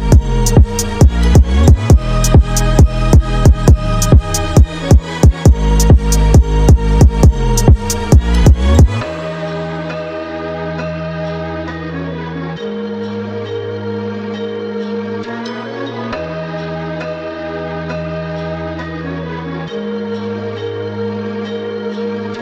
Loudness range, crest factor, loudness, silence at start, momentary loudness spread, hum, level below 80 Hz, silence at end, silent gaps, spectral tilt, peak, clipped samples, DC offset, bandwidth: 11 LU; 12 dB; -14 LUFS; 0 s; 13 LU; none; -16 dBFS; 0 s; none; -6 dB/octave; 0 dBFS; under 0.1%; under 0.1%; 15.5 kHz